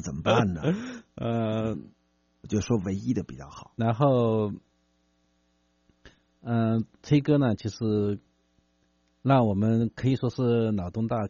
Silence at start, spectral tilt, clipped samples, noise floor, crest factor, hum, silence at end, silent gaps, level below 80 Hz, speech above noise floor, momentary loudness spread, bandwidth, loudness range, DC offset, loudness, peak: 0 s; -7.5 dB/octave; under 0.1%; -69 dBFS; 20 dB; none; 0 s; none; -56 dBFS; 44 dB; 12 LU; 7.2 kHz; 3 LU; under 0.1%; -26 LUFS; -8 dBFS